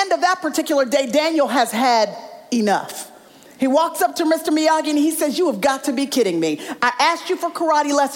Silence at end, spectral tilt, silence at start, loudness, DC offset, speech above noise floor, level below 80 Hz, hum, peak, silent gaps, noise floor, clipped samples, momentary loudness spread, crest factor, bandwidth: 0 s; -3 dB/octave; 0 s; -19 LUFS; under 0.1%; 26 dB; -68 dBFS; none; -6 dBFS; none; -44 dBFS; under 0.1%; 6 LU; 12 dB; 17 kHz